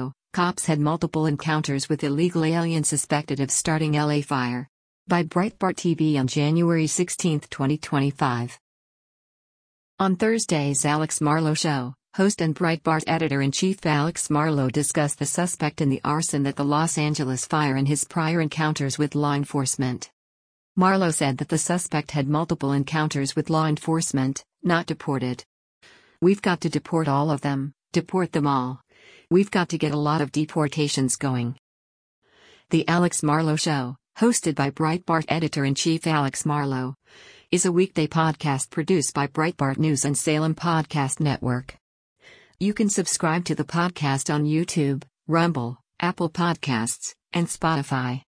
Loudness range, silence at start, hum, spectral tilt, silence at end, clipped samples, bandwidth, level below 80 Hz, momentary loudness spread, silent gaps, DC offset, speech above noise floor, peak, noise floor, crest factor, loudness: 2 LU; 0 s; none; -5 dB/octave; 0.15 s; under 0.1%; 10.5 kHz; -58 dBFS; 6 LU; 4.69-5.06 s, 8.60-9.98 s, 20.13-20.75 s, 25.46-25.81 s, 31.59-32.22 s, 41.81-42.16 s; under 0.1%; over 67 dB; -6 dBFS; under -90 dBFS; 16 dB; -23 LUFS